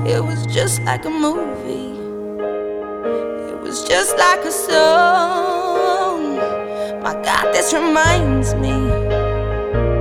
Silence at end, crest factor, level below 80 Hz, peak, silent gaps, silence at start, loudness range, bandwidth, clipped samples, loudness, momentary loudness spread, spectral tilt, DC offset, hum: 0 s; 18 dB; -30 dBFS; 0 dBFS; none; 0 s; 6 LU; 17.5 kHz; under 0.1%; -17 LUFS; 12 LU; -4.5 dB/octave; under 0.1%; none